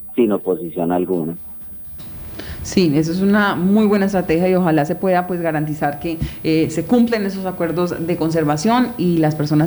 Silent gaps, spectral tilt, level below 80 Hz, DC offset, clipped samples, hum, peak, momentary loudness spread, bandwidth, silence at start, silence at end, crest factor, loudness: none; -7 dB/octave; -42 dBFS; under 0.1%; under 0.1%; none; -2 dBFS; 13 LU; over 20 kHz; 0 s; 0 s; 14 dB; -18 LUFS